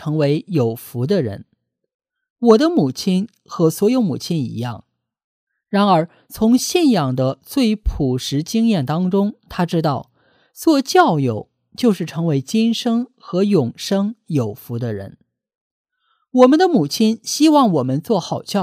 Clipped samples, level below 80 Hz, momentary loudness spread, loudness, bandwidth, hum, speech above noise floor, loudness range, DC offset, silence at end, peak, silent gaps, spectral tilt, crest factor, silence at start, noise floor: under 0.1%; -40 dBFS; 12 LU; -18 LUFS; 16 kHz; none; 48 dB; 3 LU; under 0.1%; 0 s; 0 dBFS; 1.94-1.99 s, 2.30-2.36 s, 5.24-5.47 s, 15.55-15.85 s; -6 dB/octave; 18 dB; 0 s; -65 dBFS